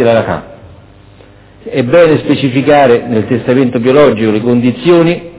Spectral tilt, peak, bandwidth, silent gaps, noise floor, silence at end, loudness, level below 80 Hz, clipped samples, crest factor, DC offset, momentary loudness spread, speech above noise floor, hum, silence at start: -11 dB/octave; 0 dBFS; 4 kHz; none; -38 dBFS; 0 s; -9 LUFS; -42 dBFS; 0.7%; 10 dB; under 0.1%; 6 LU; 29 dB; none; 0 s